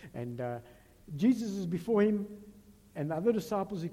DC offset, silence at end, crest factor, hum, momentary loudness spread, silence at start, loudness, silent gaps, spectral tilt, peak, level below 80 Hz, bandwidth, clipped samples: under 0.1%; 0 s; 16 dB; none; 16 LU; 0 s; -32 LUFS; none; -7.5 dB/octave; -16 dBFS; -64 dBFS; 16 kHz; under 0.1%